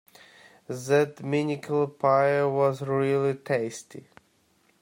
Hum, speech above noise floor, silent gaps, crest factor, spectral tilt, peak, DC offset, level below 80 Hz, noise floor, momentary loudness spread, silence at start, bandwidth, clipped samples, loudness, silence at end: none; 41 dB; none; 18 dB; -6.5 dB/octave; -10 dBFS; under 0.1%; -72 dBFS; -66 dBFS; 14 LU; 0.7 s; 16 kHz; under 0.1%; -25 LUFS; 0.8 s